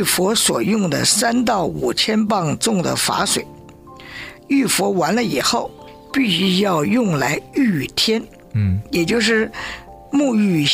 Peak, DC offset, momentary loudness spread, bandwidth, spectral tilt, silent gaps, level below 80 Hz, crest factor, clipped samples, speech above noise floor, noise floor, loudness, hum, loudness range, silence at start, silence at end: -4 dBFS; under 0.1%; 9 LU; 16 kHz; -4 dB/octave; none; -48 dBFS; 14 dB; under 0.1%; 22 dB; -40 dBFS; -18 LUFS; none; 3 LU; 0 s; 0 s